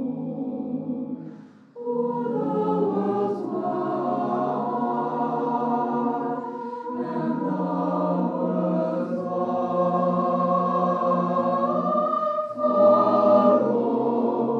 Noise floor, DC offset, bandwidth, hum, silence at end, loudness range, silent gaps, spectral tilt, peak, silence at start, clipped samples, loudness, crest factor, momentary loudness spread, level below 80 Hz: -44 dBFS; under 0.1%; 6.4 kHz; none; 0 s; 6 LU; none; -10 dB/octave; -6 dBFS; 0 s; under 0.1%; -24 LUFS; 18 dB; 12 LU; under -90 dBFS